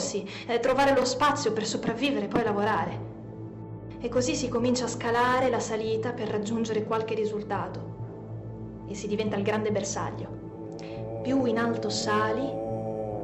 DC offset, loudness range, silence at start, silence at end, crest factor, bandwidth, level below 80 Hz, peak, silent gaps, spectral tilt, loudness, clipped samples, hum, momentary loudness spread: under 0.1%; 5 LU; 0 s; 0 s; 14 dB; 13.5 kHz; -54 dBFS; -14 dBFS; none; -4.5 dB/octave; -28 LUFS; under 0.1%; none; 15 LU